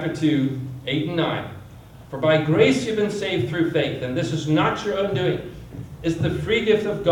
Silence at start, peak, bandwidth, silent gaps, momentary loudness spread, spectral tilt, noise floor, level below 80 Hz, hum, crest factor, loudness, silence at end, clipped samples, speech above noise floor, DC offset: 0 s; -4 dBFS; 17 kHz; none; 12 LU; -6.5 dB/octave; -42 dBFS; -48 dBFS; none; 18 dB; -22 LUFS; 0 s; under 0.1%; 21 dB; under 0.1%